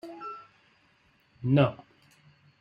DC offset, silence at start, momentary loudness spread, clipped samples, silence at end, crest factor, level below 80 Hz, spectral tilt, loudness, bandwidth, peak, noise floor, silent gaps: under 0.1%; 0.05 s; 22 LU; under 0.1%; 0.85 s; 22 dB; -68 dBFS; -9.5 dB/octave; -28 LUFS; 5.6 kHz; -10 dBFS; -66 dBFS; none